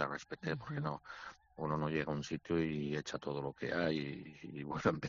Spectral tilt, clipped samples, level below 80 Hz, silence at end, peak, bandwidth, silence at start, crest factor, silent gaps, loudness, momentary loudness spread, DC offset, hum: -5.5 dB/octave; under 0.1%; -66 dBFS; 0 s; -16 dBFS; 7.2 kHz; 0 s; 22 dB; none; -39 LUFS; 12 LU; under 0.1%; none